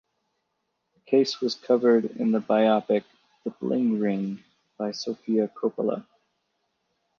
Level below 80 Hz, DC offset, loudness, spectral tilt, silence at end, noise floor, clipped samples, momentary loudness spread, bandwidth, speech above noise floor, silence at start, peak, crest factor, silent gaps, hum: -76 dBFS; under 0.1%; -25 LUFS; -6 dB/octave; 1.2 s; -78 dBFS; under 0.1%; 12 LU; 7.2 kHz; 54 dB; 1.1 s; -8 dBFS; 18 dB; none; none